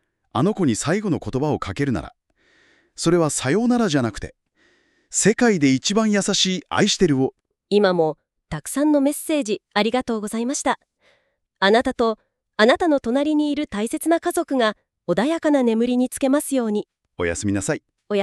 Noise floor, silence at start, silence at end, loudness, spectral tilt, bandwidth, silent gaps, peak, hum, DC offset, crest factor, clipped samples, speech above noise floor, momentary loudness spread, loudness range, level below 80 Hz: -66 dBFS; 0.35 s; 0 s; -21 LUFS; -4.5 dB/octave; 13.5 kHz; none; -2 dBFS; none; under 0.1%; 18 dB; under 0.1%; 46 dB; 10 LU; 3 LU; -50 dBFS